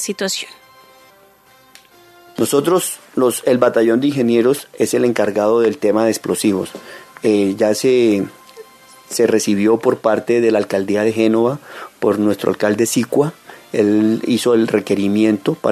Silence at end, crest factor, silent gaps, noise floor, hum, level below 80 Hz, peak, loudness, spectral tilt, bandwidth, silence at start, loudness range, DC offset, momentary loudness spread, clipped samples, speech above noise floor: 0 s; 16 dB; none; -49 dBFS; none; -64 dBFS; 0 dBFS; -16 LUFS; -5 dB/octave; 14 kHz; 0 s; 2 LU; under 0.1%; 8 LU; under 0.1%; 34 dB